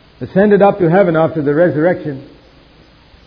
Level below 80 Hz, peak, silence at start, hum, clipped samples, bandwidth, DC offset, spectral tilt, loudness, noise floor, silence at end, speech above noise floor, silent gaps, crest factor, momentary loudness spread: -48 dBFS; 0 dBFS; 0.2 s; none; under 0.1%; 5.2 kHz; under 0.1%; -11 dB/octave; -12 LUFS; -45 dBFS; 1 s; 33 dB; none; 14 dB; 11 LU